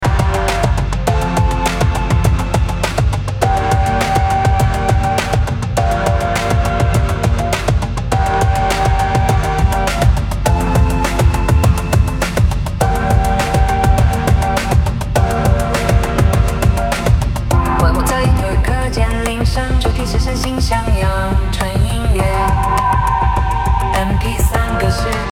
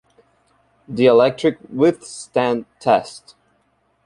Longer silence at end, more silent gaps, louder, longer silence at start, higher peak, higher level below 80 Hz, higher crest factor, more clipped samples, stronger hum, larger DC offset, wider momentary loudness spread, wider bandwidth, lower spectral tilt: second, 0 s vs 0.85 s; neither; first, -15 LUFS vs -18 LUFS; second, 0 s vs 0.9 s; about the same, 0 dBFS vs -2 dBFS; first, -18 dBFS vs -60 dBFS; about the same, 14 dB vs 18 dB; neither; neither; neither; second, 3 LU vs 15 LU; first, 17 kHz vs 11 kHz; about the same, -5.5 dB/octave vs -5.5 dB/octave